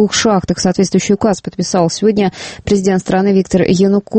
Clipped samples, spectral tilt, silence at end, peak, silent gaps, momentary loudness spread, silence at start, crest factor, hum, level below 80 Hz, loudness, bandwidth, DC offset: under 0.1%; -5 dB/octave; 0 s; 0 dBFS; none; 5 LU; 0 s; 12 dB; none; -40 dBFS; -13 LUFS; 8.8 kHz; under 0.1%